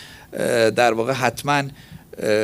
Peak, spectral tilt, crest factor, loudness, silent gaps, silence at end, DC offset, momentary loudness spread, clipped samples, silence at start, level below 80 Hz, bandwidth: -2 dBFS; -4.5 dB/octave; 18 dB; -20 LUFS; none; 0 s; under 0.1%; 15 LU; under 0.1%; 0 s; -56 dBFS; 16 kHz